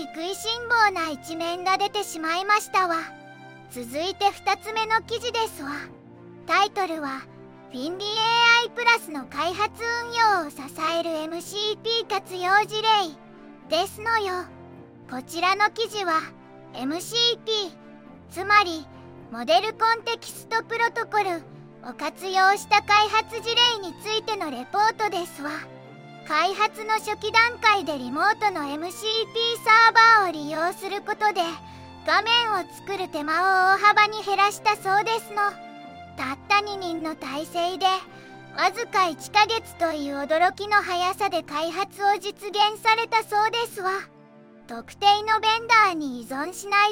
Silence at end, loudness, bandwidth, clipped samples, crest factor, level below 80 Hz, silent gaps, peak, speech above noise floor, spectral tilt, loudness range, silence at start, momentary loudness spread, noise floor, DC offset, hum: 0 s; -23 LUFS; 17 kHz; under 0.1%; 20 dB; -66 dBFS; none; -4 dBFS; 26 dB; -2 dB/octave; 6 LU; 0 s; 14 LU; -50 dBFS; under 0.1%; none